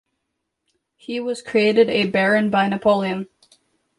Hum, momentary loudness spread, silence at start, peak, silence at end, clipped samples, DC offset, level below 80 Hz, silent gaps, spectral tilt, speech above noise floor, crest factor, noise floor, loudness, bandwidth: none; 13 LU; 1.1 s; -4 dBFS; 0.75 s; under 0.1%; under 0.1%; -62 dBFS; none; -6 dB/octave; 59 dB; 18 dB; -77 dBFS; -19 LUFS; 11.5 kHz